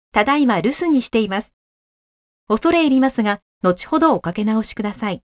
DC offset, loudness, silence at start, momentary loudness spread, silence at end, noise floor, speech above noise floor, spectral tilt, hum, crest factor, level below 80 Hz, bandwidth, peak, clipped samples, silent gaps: under 0.1%; -18 LUFS; 0.15 s; 8 LU; 0.2 s; under -90 dBFS; over 72 dB; -10 dB/octave; none; 18 dB; -50 dBFS; 4 kHz; 0 dBFS; under 0.1%; 1.53-2.47 s, 3.42-3.61 s